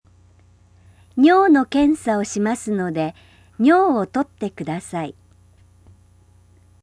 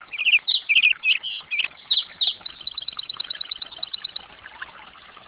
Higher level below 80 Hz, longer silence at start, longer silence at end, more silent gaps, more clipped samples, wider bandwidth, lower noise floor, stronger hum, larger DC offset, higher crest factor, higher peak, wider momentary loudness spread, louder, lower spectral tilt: first, -54 dBFS vs -66 dBFS; first, 1.15 s vs 0 s; first, 1.7 s vs 0.1 s; neither; neither; first, 11 kHz vs 4 kHz; first, -52 dBFS vs -45 dBFS; first, 60 Hz at -50 dBFS vs none; neither; about the same, 18 dB vs 22 dB; about the same, -4 dBFS vs -4 dBFS; second, 14 LU vs 17 LU; about the same, -19 LUFS vs -21 LUFS; first, -5.5 dB/octave vs 5.5 dB/octave